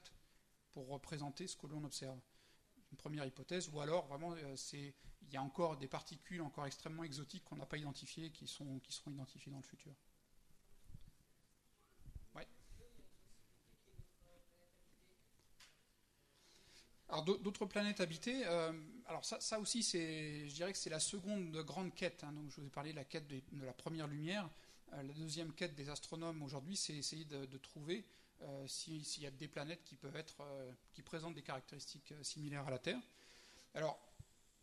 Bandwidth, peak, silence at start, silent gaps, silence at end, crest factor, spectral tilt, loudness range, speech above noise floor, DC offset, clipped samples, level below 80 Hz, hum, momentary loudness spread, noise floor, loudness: 13 kHz; -26 dBFS; 0 s; none; 0.4 s; 22 dB; -4 dB/octave; 19 LU; 29 dB; under 0.1%; under 0.1%; -70 dBFS; none; 22 LU; -75 dBFS; -46 LUFS